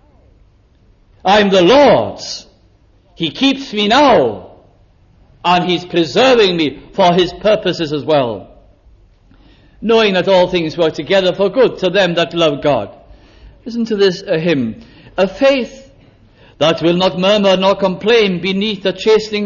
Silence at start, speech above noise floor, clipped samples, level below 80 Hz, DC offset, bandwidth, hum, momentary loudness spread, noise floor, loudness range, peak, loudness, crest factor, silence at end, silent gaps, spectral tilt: 1.25 s; 37 dB; under 0.1%; -46 dBFS; under 0.1%; 7.4 kHz; none; 12 LU; -50 dBFS; 4 LU; 0 dBFS; -13 LUFS; 14 dB; 0 s; none; -5.5 dB/octave